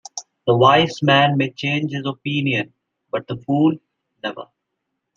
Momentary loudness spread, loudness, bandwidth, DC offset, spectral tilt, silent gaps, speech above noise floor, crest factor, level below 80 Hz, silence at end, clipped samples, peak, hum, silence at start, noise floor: 17 LU; -18 LUFS; 7.6 kHz; under 0.1%; -5.5 dB/octave; none; 59 dB; 20 dB; -62 dBFS; 0.7 s; under 0.1%; -2 dBFS; none; 0.15 s; -77 dBFS